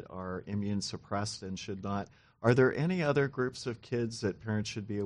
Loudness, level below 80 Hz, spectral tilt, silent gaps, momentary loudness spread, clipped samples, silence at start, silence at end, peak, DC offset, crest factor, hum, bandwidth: -33 LUFS; -64 dBFS; -6 dB/octave; none; 13 LU; under 0.1%; 0 s; 0 s; -12 dBFS; under 0.1%; 22 dB; none; 11 kHz